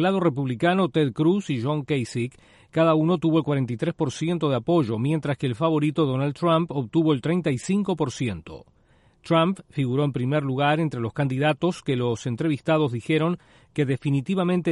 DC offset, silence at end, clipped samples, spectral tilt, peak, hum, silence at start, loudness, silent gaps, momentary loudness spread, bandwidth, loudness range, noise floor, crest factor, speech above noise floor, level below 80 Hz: under 0.1%; 0 s; under 0.1%; -7 dB/octave; -8 dBFS; none; 0 s; -24 LUFS; none; 6 LU; 11.5 kHz; 2 LU; -59 dBFS; 16 dB; 36 dB; -58 dBFS